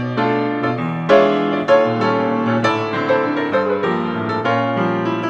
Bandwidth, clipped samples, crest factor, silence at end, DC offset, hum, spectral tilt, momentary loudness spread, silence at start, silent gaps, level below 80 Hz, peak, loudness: 8 kHz; under 0.1%; 16 dB; 0 s; under 0.1%; none; -7 dB/octave; 6 LU; 0 s; none; -60 dBFS; -2 dBFS; -17 LUFS